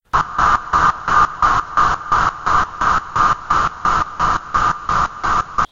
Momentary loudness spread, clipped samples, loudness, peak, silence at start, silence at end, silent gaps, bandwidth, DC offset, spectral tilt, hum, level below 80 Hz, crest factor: 4 LU; under 0.1%; -16 LUFS; -2 dBFS; 0.15 s; 0.05 s; none; 7.6 kHz; under 0.1%; -3.5 dB/octave; none; -32 dBFS; 14 dB